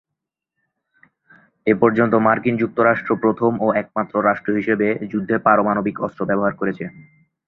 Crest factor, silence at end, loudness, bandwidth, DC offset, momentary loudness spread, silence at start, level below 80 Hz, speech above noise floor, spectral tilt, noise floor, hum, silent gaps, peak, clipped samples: 18 dB; 0.45 s; -19 LUFS; 4.2 kHz; under 0.1%; 9 LU; 1.65 s; -58 dBFS; 64 dB; -10 dB/octave; -83 dBFS; none; none; 0 dBFS; under 0.1%